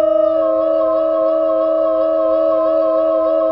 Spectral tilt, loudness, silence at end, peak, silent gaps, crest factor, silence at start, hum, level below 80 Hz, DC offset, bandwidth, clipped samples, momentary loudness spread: -9 dB/octave; -15 LUFS; 0 s; -6 dBFS; none; 8 dB; 0 s; none; -54 dBFS; 0.2%; 5.2 kHz; under 0.1%; 1 LU